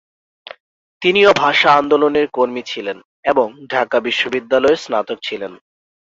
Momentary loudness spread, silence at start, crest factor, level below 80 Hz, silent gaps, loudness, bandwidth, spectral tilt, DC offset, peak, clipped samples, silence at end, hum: 14 LU; 1 s; 16 dB; -58 dBFS; 3.05-3.23 s; -16 LUFS; 7.8 kHz; -4 dB/octave; under 0.1%; 0 dBFS; under 0.1%; 0.55 s; none